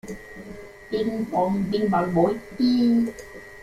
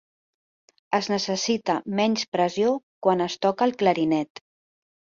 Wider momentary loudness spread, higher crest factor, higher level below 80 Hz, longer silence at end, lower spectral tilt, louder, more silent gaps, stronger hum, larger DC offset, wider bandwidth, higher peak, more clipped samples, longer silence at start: first, 20 LU vs 4 LU; about the same, 16 dB vs 18 dB; first, -52 dBFS vs -68 dBFS; second, 0 s vs 0.8 s; first, -7 dB/octave vs -4.5 dB/octave; about the same, -23 LUFS vs -24 LUFS; second, none vs 2.28-2.32 s, 2.83-3.01 s; neither; neither; first, 13.5 kHz vs 7.6 kHz; about the same, -8 dBFS vs -6 dBFS; neither; second, 0.05 s vs 0.9 s